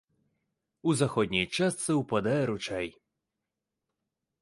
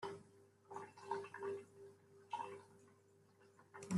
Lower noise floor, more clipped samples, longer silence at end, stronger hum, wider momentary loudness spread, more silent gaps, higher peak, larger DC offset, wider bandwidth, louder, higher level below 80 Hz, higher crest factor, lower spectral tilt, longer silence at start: first, -87 dBFS vs -71 dBFS; neither; first, 1.5 s vs 0 s; neither; second, 7 LU vs 21 LU; neither; first, -12 dBFS vs -28 dBFS; neither; about the same, 11.5 kHz vs 12.5 kHz; first, -29 LUFS vs -51 LUFS; first, -62 dBFS vs -88 dBFS; about the same, 20 dB vs 22 dB; about the same, -5 dB/octave vs -6 dB/octave; first, 0.85 s vs 0 s